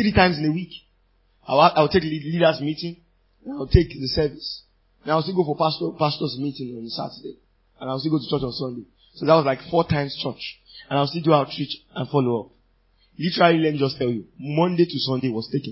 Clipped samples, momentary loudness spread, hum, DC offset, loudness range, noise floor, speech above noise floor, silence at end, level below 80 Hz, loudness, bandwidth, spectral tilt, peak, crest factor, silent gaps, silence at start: under 0.1%; 16 LU; none; under 0.1%; 4 LU; -62 dBFS; 41 dB; 0 s; -40 dBFS; -22 LUFS; 5.8 kHz; -10 dB/octave; 0 dBFS; 22 dB; none; 0 s